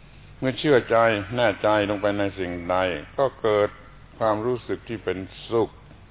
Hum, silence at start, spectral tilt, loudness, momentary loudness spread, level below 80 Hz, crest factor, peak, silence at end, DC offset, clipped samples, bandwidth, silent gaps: none; 0.15 s; -10 dB/octave; -24 LUFS; 10 LU; -50 dBFS; 18 dB; -6 dBFS; 0.05 s; under 0.1%; under 0.1%; 4 kHz; none